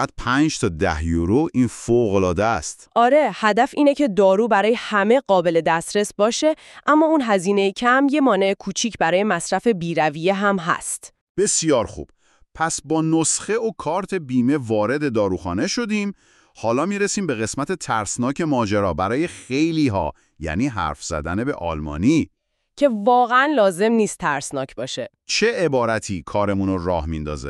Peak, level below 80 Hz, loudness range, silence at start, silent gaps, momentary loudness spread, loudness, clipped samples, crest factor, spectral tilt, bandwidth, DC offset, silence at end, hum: -4 dBFS; -42 dBFS; 5 LU; 0 s; 11.21-11.35 s; 9 LU; -20 LUFS; under 0.1%; 16 dB; -4.5 dB/octave; 12.5 kHz; under 0.1%; 0 s; none